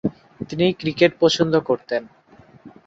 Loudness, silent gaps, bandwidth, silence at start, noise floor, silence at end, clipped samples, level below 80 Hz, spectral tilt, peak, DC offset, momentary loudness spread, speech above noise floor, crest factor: -20 LUFS; none; 7.8 kHz; 0.05 s; -47 dBFS; 0.2 s; under 0.1%; -56 dBFS; -5.5 dB/octave; -2 dBFS; under 0.1%; 12 LU; 27 dB; 20 dB